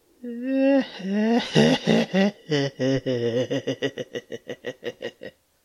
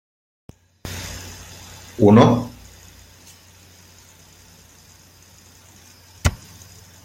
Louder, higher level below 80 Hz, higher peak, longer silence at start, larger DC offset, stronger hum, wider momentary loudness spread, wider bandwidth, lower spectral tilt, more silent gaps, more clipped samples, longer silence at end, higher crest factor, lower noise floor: second, -23 LUFS vs -18 LUFS; second, -60 dBFS vs -42 dBFS; about the same, -2 dBFS vs -2 dBFS; second, 0.25 s vs 0.85 s; neither; neither; second, 17 LU vs 30 LU; second, 12.5 kHz vs 16.5 kHz; about the same, -6 dB/octave vs -6.5 dB/octave; neither; neither; second, 0.35 s vs 0.7 s; about the same, 22 dB vs 22 dB; second, -44 dBFS vs -49 dBFS